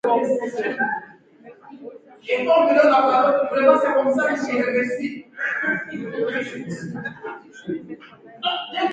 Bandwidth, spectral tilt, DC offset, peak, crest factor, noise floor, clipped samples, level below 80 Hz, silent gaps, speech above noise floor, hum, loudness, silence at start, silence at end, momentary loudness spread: 9 kHz; -5 dB/octave; under 0.1%; -2 dBFS; 20 dB; -47 dBFS; under 0.1%; -68 dBFS; none; 26 dB; none; -21 LUFS; 0.05 s; 0 s; 20 LU